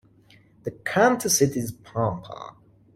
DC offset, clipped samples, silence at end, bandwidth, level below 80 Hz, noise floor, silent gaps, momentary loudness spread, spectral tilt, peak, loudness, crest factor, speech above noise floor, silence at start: under 0.1%; under 0.1%; 0.45 s; 16.5 kHz; -58 dBFS; -56 dBFS; none; 19 LU; -4 dB/octave; -6 dBFS; -23 LUFS; 18 dB; 32 dB; 0.65 s